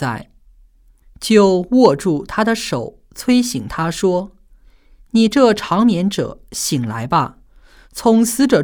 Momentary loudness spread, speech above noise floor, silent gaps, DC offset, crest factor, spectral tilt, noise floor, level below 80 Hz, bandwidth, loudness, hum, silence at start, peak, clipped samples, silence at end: 12 LU; 34 dB; none; under 0.1%; 16 dB; -5 dB/octave; -49 dBFS; -46 dBFS; over 20 kHz; -16 LUFS; none; 0 s; 0 dBFS; under 0.1%; 0 s